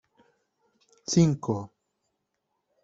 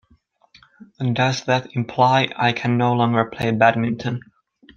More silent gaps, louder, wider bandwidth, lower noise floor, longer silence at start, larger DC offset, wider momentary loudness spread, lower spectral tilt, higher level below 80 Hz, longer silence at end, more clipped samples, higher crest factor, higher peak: neither; second, -26 LUFS vs -19 LUFS; about the same, 8 kHz vs 7.4 kHz; first, -80 dBFS vs -59 dBFS; about the same, 1.1 s vs 1 s; neither; first, 19 LU vs 9 LU; about the same, -6 dB/octave vs -6 dB/octave; second, -64 dBFS vs -56 dBFS; first, 1.15 s vs 0.55 s; neither; about the same, 20 dB vs 18 dB; second, -10 dBFS vs -2 dBFS